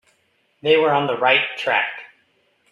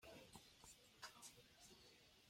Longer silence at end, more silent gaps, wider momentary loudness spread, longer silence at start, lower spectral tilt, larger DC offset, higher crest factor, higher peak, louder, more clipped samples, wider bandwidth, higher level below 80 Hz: first, 0.65 s vs 0 s; neither; first, 11 LU vs 7 LU; first, 0.65 s vs 0 s; first, -5 dB/octave vs -2 dB/octave; neither; about the same, 18 dB vs 22 dB; first, -2 dBFS vs -42 dBFS; first, -18 LUFS vs -63 LUFS; neither; second, 7.2 kHz vs 16.5 kHz; first, -70 dBFS vs -82 dBFS